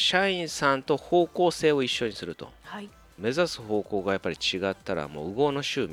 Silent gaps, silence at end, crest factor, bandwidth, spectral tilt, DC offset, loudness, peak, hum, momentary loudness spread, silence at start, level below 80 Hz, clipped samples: none; 0 s; 20 dB; 15.5 kHz; -4 dB/octave; under 0.1%; -27 LUFS; -8 dBFS; none; 16 LU; 0 s; -58 dBFS; under 0.1%